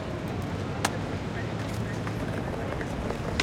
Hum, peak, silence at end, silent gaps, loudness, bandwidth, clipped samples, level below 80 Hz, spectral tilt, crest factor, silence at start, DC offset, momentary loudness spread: none; -6 dBFS; 0 s; none; -32 LUFS; 16.5 kHz; under 0.1%; -44 dBFS; -5.5 dB/octave; 26 dB; 0 s; under 0.1%; 3 LU